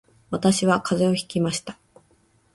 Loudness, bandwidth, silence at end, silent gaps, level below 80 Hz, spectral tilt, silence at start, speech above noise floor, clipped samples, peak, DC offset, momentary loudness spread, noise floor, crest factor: -23 LUFS; 11.5 kHz; 0.8 s; none; -58 dBFS; -5 dB/octave; 0.3 s; 40 dB; under 0.1%; -6 dBFS; under 0.1%; 11 LU; -62 dBFS; 18 dB